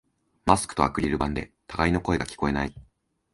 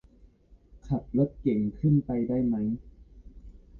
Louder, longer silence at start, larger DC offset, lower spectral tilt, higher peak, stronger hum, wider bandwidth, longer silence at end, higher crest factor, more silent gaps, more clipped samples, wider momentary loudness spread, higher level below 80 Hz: about the same, -26 LUFS vs -28 LUFS; second, 0.45 s vs 0.75 s; neither; second, -5.5 dB/octave vs -12 dB/octave; first, -2 dBFS vs -12 dBFS; neither; first, 11.5 kHz vs 4.2 kHz; first, 0.55 s vs 0 s; first, 24 dB vs 16 dB; neither; neither; about the same, 9 LU vs 8 LU; first, -40 dBFS vs -50 dBFS